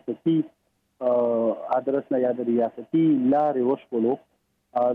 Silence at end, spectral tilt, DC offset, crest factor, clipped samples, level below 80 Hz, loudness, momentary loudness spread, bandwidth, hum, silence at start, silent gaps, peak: 0 s; -10.5 dB/octave; under 0.1%; 12 dB; under 0.1%; -74 dBFS; -24 LUFS; 6 LU; 4 kHz; none; 0.05 s; none; -12 dBFS